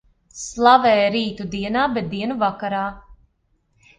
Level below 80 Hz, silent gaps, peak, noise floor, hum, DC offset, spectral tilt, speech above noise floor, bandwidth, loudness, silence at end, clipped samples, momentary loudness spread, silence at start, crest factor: -50 dBFS; none; 0 dBFS; -66 dBFS; none; under 0.1%; -4.5 dB/octave; 47 dB; 9.8 kHz; -19 LUFS; 0.85 s; under 0.1%; 14 LU; 0.35 s; 20 dB